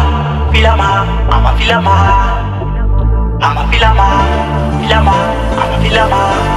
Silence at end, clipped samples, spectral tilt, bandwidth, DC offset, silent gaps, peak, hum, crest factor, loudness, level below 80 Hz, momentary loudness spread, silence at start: 0 s; 0.3%; -6 dB/octave; 10.5 kHz; under 0.1%; none; 0 dBFS; none; 10 dB; -11 LUFS; -14 dBFS; 5 LU; 0 s